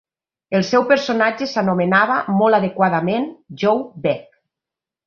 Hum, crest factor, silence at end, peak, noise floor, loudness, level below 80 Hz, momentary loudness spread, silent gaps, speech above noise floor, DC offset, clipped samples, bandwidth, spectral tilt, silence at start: none; 16 dB; 0.85 s; -2 dBFS; -87 dBFS; -18 LUFS; -62 dBFS; 7 LU; none; 70 dB; under 0.1%; under 0.1%; 7 kHz; -6 dB/octave; 0.5 s